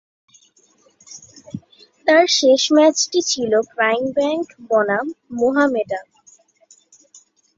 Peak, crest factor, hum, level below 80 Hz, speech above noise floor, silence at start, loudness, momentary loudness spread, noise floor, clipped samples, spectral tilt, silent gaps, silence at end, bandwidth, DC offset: -2 dBFS; 18 dB; none; -64 dBFS; 40 dB; 1.1 s; -17 LUFS; 22 LU; -57 dBFS; under 0.1%; -2.5 dB/octave; none; 1.55 s; 7.8 kHz; under 0.1%